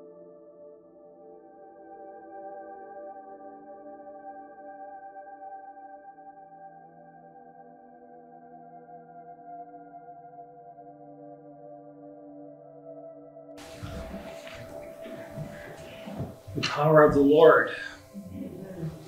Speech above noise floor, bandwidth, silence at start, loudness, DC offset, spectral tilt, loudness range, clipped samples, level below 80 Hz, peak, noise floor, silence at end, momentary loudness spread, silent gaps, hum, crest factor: 33 dB; 15.5 kHz; 0 s; -24 LUFS; under 0.1%; -6.5 dB/octave; 25 LU; under 0.1%; -58 dBFS; -4 dBFS; -52 dBFS; 0 s; 27 LU; none; none; 26 dB